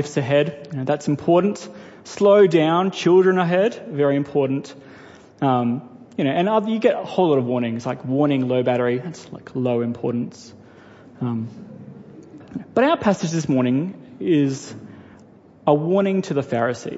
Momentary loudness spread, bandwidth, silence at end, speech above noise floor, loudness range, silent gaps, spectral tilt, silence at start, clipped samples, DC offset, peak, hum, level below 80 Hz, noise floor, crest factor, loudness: 17 LU; 8 kHz; 0 s; 28 dB; 7 LU; none; -6.5 dB/octave; 0 s; under 0.1%; under 0.1%; -4 dBFS; none; -64 dBFS; -48 dBFS; 18 dB; -20 LUFS